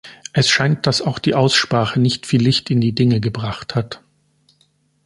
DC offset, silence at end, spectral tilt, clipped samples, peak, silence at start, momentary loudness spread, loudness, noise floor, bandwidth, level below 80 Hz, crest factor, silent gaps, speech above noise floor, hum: under 0.1%; 1.1 s; -5 dB/octave; under 0.1%; -2 dBFS; 0.05 s; 9 LU; -17 LUFS; -61 dBFS; 11.5 kHz; -50 dBFS; 16 dB; none; 44 dB; none